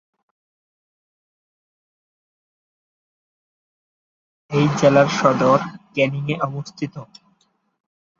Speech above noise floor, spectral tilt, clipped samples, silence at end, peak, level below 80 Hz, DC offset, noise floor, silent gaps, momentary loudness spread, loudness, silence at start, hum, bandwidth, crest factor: 47 dB; -6 dB/octave; under 0.1%; 1.15 s; -2 dBFS; -62 dBFS; under 0.1%; -65 dBFS; none; 15 LU; -18 LUFS; 4.5 s; none; 7.6 kHz; 22 dB